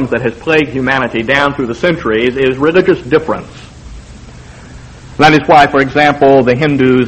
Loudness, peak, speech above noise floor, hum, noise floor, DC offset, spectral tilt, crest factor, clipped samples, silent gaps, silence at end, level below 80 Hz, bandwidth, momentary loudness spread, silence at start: -10 LUFS; 0 dBFS; 22 dB; none; -32 dBFS; under 0.1%; -6 dB/octave; 12 dB; 0.4%; none; 0 s; -36 dBFS; 9.2 kHz; 8 LU; 0 s